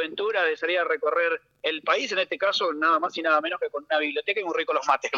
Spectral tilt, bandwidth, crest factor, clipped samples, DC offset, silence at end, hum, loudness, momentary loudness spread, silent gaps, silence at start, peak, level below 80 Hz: -2 dB/octave; 7.6 kHz; 16 dB; under 0.1%; under 0.1%; 0 s; 50 Hz at -75 dBFS; -25 LUFS; 4 LU; none; 0 s; -8 dBFS; -78 dBFS